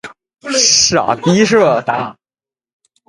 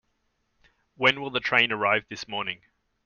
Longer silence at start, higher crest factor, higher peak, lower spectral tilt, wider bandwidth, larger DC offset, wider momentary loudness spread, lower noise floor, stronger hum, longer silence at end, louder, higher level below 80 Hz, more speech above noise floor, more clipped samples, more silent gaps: second, 0.05 s vs 1 s; second, 14 dB vs 24 dB; first, 0 dBFS vs -4 dBFS; about the same, -3 dB/octave vs -3.5 dB/octave; first, 11.5 kHz vs 7.2 kHz; neither; about the same, 13 LU vs 12 LU; first, under -90 dBFS vs -74 dBFS; neither; first, 0.95 s vs 0.5 s; first, -12 LUFS vs -24 LUFS; first, -52 dBFS vs -66 dBFS; first, over 78 dB vs 48 dB; neither; neither